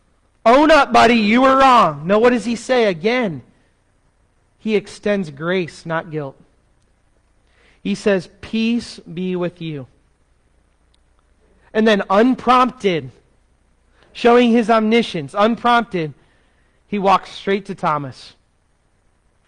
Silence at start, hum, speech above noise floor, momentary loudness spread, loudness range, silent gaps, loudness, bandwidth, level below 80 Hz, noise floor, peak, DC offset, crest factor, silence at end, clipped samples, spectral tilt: 0.45 s; none; 44 dB; 16 LU; 10 LU; none; -16 LUFS; 10.5 kHz; -48 dBFS; -60 dBFS; -4 dBFS; under 0.1%; 14 dB; 1.2 s; under 0.1%; -5.5 dB/octave